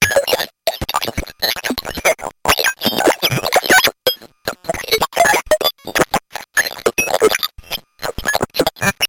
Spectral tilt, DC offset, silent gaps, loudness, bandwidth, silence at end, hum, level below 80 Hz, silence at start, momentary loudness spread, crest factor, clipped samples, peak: -2 dB/octave; under 0.1%; none; -16 LUFS; 17 kHz; 0 s; none; -40 dBFS; 0 s; 10 LU; 16 dB; under 0.1%; -2 dBFS